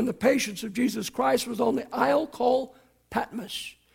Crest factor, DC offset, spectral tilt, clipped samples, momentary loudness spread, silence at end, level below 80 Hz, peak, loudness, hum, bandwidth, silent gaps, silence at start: 18 dB; under 0.1%; -4 dB/octave; under 0.1%; 10 LU; 0.25 s; -62 dBFS; -8 dBFS; -27 LUFS; none; 17 kHz; none; 0 s